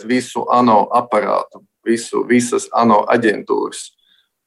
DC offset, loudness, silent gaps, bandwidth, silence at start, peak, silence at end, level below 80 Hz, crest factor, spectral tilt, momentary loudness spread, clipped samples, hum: under 0.1%; -16 LUFS; none; 12.5 kHz; 0 s; -2 dBFS; 0.6 s; -64 dBFS; 14 dB; -4.5 dB/octave; 13 LU; under 0.1%; none